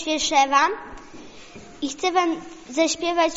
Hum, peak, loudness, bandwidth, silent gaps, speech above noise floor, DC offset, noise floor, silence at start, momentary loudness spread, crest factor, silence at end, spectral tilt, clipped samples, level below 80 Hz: none; -6 dBFS; -22 LUFS; 8 kHz; none; 21 dB; under 0.1%; -42 dBFS; 0 s; 24 LU; 18 dB; 0 s; 0 dB/octave; under 0.1%; -54 dBFS